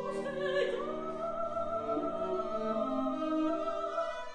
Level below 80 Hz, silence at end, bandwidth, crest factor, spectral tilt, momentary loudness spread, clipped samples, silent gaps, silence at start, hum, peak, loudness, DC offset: -58 dBFS; 0 s; 10 kHz; 14 dB; -6 dB/octave; 4 LU; under 0.1%; none; 0 s; none; -20 dBFS; -34 LUFS; under 0.1%